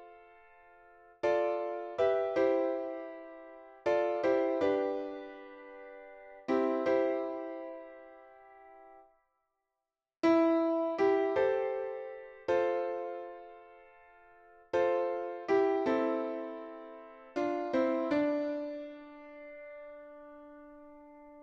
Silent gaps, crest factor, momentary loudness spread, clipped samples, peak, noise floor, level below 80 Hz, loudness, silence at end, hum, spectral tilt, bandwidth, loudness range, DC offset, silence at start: none; 18 dB; 21 LU; under 0.1%; -16 dBFS; under -90 dBFS; -72 dBFS; -32 LUFS; 0 s; none; -6 dB/octave; 7.4 kHz; 5 LU; under 0.1%; 0 s